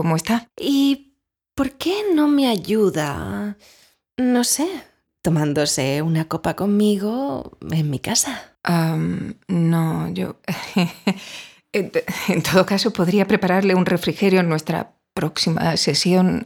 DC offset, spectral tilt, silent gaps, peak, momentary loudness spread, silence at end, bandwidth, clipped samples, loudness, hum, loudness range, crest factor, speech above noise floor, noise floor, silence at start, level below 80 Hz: under 0.1%; -5 dB/octave; none; -2 dBFS; 10 LU; 0 s; 18 kHz; under 0.1%; -20 LUFS; none; 3 LU; 18 dB; 44 dB; -64 dBFS; 0 s; -52 dBFS